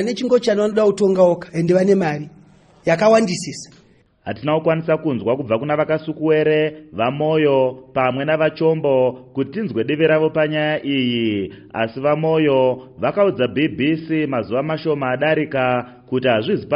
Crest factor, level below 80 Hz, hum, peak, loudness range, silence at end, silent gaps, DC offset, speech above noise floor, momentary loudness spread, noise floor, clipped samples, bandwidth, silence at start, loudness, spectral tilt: 16 dB; -58 dBFS; none; -2 dBFS; 2 LU; 0 s; none; under 0.1%; 35 dB; 8 LU; -53 dBFS; under 0.1%; 11 kHz; 0 s; -18 LUFS; -6.5 dB/octave